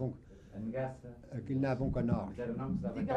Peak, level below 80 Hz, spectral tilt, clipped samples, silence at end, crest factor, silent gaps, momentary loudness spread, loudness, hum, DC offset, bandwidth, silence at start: -20 dBFS; -52 dBFS; -9.5 dB/octave; under 0.1%; 0 s; 16 dB; none; 14 LU; -37 LUFS; none; under 0.1%; 8.6 kHz; 0 s